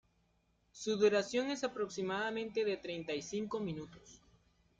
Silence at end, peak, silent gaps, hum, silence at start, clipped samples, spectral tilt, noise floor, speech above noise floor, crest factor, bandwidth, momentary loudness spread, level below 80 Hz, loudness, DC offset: 0.65 s; -18 dBFS; none; none; 0.75 s; under 0.1%; -4.5 dB/octave; -75 dBFS; 39 dB; 20 dB; 7.8 kHz; 11 LU; -72 dBFS; -37 LUFS; under 0.1%